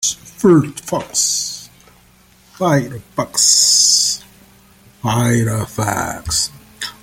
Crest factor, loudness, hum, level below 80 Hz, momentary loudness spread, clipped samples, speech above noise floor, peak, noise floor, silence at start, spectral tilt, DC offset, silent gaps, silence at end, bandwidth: 18 dB; -15 LUFS; none; -46 dBFS; 16 LU; under 0.1%; 34 dB; 0 dBFS; -49 dBFS; 0 s; -3 dB/octave; under 0.1%; none; 0.1 s; 17 kHz